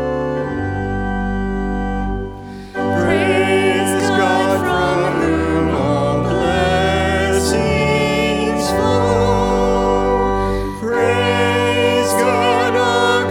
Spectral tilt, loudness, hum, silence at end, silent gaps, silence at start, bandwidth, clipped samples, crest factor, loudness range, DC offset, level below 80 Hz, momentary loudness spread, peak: -5 dB/octave; -16 LUFS; none; 0 s; none; 0 s; 18 kHz; under 0.1%; 14 dB; 2 LU; under 0.1%; -30 dBFS; 7 LU; -2 dBFS